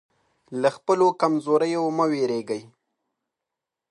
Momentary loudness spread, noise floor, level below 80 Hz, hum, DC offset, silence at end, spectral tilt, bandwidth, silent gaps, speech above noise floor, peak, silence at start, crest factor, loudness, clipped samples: 11 LU; -86 dBFS; -78 dBFS; none; under 0.1%; 1.25 s; -6 dB/octave; 11 kHz; none; 63 dB; -6 dBFS; 0.5 s; 18 dB; -23 LUFS; under 0.1%